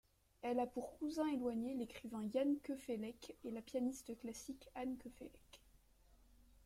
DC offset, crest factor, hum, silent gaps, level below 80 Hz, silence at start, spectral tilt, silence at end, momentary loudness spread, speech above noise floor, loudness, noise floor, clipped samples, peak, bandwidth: under 0.1%; 18 dB; none; none; -72 dBFS; 0.45 s; -5 dB/octave; 1.1 s; 12 LU; 26 dB; -44 LUFS; -70 dBFS; under 0.1%; -28 dBFS; 16 kHz